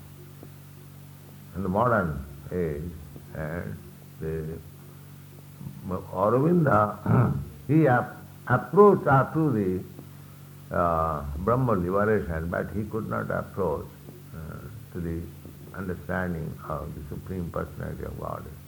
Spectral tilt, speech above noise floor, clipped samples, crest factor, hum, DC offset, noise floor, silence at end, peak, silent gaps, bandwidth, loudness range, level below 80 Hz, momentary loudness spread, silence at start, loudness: -9 dB/octave; 20 dB; under 0.1%; 22 dB; none; under 0.1%; -46 dBFS; 0 s; -4 dBFS; none; 19.5 kHz; 12 LU; -46 dBFS; 24 LU; 0 s; -26 LUFS